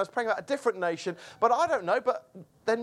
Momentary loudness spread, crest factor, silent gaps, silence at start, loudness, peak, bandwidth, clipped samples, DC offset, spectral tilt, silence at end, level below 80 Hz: 10 LU; 18 dB; none; 0 s; -29 LUFS; -10 dBFS; 12.5 kHz; under 0.1%; under 0.1%; -4 dB/octave; 0 s; -74 dBFS